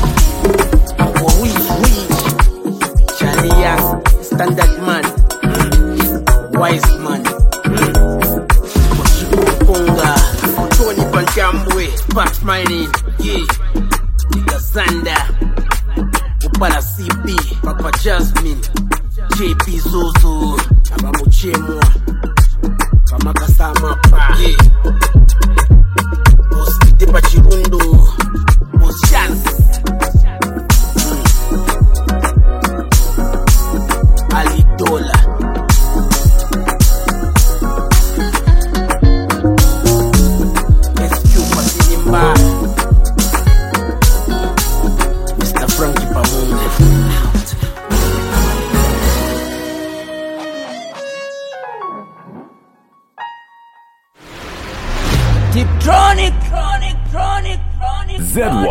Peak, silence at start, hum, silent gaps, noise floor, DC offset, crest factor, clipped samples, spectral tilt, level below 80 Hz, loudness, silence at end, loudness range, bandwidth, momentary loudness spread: 0 dBFS; 0 s; none; none; -52 dBFS; under 0.1%; 10 dB; 0.1%; -5 dB/octave; -12 dBFS; -13 LUFS; 0 s; 6 LU; 17 kHz; 8 LU